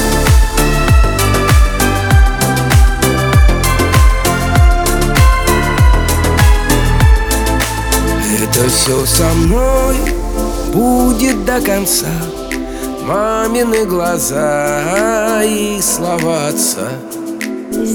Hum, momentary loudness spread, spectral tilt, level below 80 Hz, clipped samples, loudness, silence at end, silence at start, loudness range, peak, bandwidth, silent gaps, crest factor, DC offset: none; 8 LU; -4.5 dB/octave; -16 dBFS; under 0.1%; -12 LUFS; 0 s; 0 s; 3 LU; 0 dBFS; over 20 kHz; none; 12 dB; under 0.1%